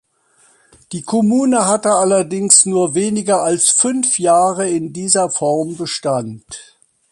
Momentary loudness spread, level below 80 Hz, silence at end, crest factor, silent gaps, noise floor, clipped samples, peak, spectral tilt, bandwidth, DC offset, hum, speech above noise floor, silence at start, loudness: 13 LU; -60 dBFS; 0.5 s; 16 dB; none; -55 dBFS; under 0.1%; 0 dBFS; -3.5 dB/octave; 13 kHz; under 0.1%; none; 40 dB; 0.9 s; -14 LUFS